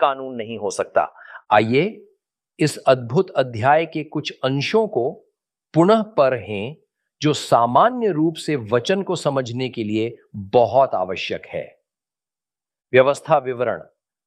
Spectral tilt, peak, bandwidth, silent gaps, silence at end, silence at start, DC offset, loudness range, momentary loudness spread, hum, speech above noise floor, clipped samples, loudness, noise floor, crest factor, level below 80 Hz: -5.5 dB/octave; -2 dBFS; 14 kHz; none; 0.45 s; 0 s; under 0.1%; 3 LU; 12 LU; none; over 71 dB; under 0.1%; -20 LUFS; under -90 dBFS; 18 dB; -64 dBFS